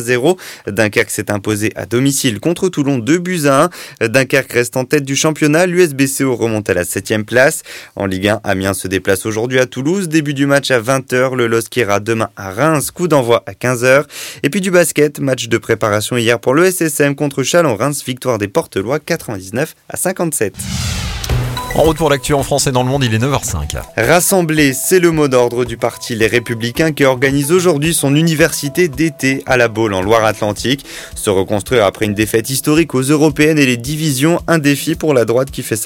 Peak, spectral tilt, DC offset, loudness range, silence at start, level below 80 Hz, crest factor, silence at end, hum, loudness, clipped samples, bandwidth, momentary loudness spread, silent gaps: 0 dBFS; -4.5 dB/octave; under 0.1%; 3 LU; 0 s; -36 dBFS; 14 dB; 0 s; none; -14 LUFS; under 0.1%; 17 kHz; 7 LU; none